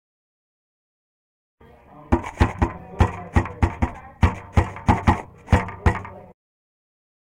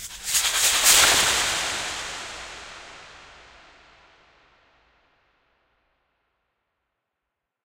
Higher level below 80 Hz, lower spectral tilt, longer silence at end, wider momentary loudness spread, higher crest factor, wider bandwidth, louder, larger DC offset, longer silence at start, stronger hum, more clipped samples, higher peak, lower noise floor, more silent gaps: first, -30 dBFS vs -52 dBFS; first, -7.5 dB/octave vs 1.5 dB/octave; second, 1.1 s vs 4.4 s; second, 7 LU vs 25 LU; second, 18 dB vs 24 dB; second, 10.5 kHz vs 16 kHz; second, -23 LUFS vs -19 LUFS; neither; first, 2 s vs 0 s; neither; neither; about the same, -4 dBFS vs -2 dBFS; second, -47 dBFS vs -83 dBFS; neither